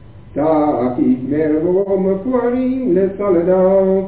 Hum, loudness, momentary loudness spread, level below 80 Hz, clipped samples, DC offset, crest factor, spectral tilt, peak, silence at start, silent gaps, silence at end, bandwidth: none; -15 LUFS; 4 LU; -44 dBFS; under 0.1%; 0.7%; 12 dB; -13 dB/octave; -4 dBFS; 0.1 s; none; 0 s; 4 kHz